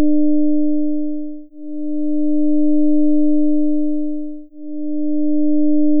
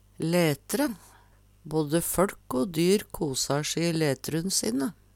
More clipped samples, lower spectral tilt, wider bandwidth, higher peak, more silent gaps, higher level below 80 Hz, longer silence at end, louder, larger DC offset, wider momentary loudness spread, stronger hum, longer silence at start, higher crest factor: neither; first, -17 dB/octave vs -4.5 dB/octave; second, 0.7 kHz vs 19 kHz; first, -6 dBFS vs -10 dBFS; neither; second, -66 dBFS vs -54 dBFS; second, 0 s vs 0.25 s; first, -18 LUFS vs -27 LUFS; neither; first, 14 LU vs 6 LU; neither; second, 0 s vs 0.2 s; second, 8 dB vs 18 dB